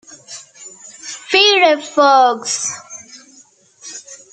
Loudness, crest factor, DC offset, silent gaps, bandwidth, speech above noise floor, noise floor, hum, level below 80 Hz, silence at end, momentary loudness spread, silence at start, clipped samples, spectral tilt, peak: -13 LUFS; 16 dB; under 0.1%; none; 9.4 kHz; 35 dB; -49 dBFS; none; -74 dBFS; 0.15 s; 24 LU; 0.1 s; under 0.1%; 0 dB/octave; 0 dBFS